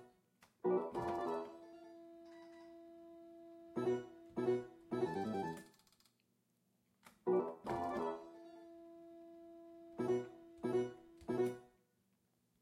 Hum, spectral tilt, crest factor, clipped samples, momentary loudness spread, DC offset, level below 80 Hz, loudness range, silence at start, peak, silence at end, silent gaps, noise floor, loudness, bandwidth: none; -7.5 dB/octave; 18 dB; under 0.1%; 20 LU; under 0.1%; -76 dBFS; 2 LU; 0 s; -26 dBFS; 0.95 s; none; -80 dBFS; -41 LUFS; 11.5 kHz